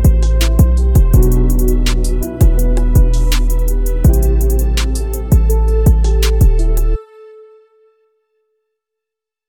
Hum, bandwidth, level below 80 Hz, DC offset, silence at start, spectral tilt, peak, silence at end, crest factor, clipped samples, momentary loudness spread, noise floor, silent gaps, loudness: none; 18.5 kHz; -12 dBFS; 0.7%; 0 s; -6.5 dB/octave; 0 dBFS; 2.45 s; 12 dB; under 0.1%; 6 LU; -83 dBFS; none; -14 LUFS